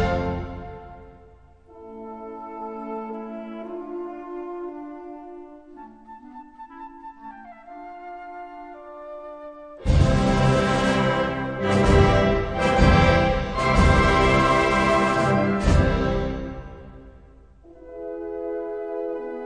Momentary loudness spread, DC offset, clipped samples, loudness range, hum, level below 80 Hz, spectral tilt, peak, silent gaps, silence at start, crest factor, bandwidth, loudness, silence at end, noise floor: 24 LU; under 0.1%; under 0.1%; 21 LU; none; -30 dBFS; -6.5 dB/octave; -4 dBFS; none; 0 s; 20 dB; 10.5 kHz; -21 LUFS; 0 s; -50 dBFS